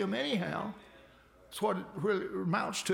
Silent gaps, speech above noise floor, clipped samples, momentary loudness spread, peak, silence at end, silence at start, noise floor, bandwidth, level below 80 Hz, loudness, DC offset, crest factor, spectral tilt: none; 26 dB; under 0.1%; 10 LU; -18 dBFS; 0 s; 0 s; -60 dBFS; 17 kHz; -68 dBFS; -34 LUFS; under 0.1%; 16 dB; -4.5 dB/octave